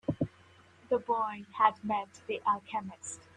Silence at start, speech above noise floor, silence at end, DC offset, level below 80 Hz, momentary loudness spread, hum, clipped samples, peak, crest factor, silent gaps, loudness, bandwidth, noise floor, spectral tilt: 0.1 s; 27 dB; 0.15 s; under 0.1%; -68 dBFS; 11 LU; none; under 0.1%; -10 dBFS; 24 dB; none; -33 LUFS; 11 kHz; -60 dBFS; -5 dB/octave